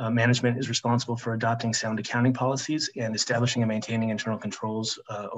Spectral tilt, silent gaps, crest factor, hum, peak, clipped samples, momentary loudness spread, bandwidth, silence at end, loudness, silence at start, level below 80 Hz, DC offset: -4.5 dB/octave; none; 18 dB; none; -8 dBFS; under 0.1%; 7 LU; 8.4 kHz; 0 s; -27 LUFS; 0 s; -68 dBFS; under 0.1%